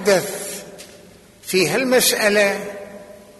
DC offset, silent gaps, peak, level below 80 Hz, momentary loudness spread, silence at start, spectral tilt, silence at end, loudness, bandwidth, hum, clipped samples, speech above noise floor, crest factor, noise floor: under 0.1%; none; -4 dBFS; -58 dBFS; 22 LU; 0 s; -2.5 dB/octave; 0.2 s; -17 LUFS; 12.5 kHz; none; under 0.1%; 28 dB; 18 dB; -46 dBFS